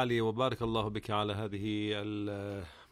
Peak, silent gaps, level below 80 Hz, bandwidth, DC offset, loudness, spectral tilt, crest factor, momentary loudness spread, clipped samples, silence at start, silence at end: -16 dBFS; none; -58 dBFS; 14.5 kHz; under 0.1%; -35 LUFS; -6.5 dB/octave; 18 dB; 8 LU; under 0.1%; 0 s; 0.1 s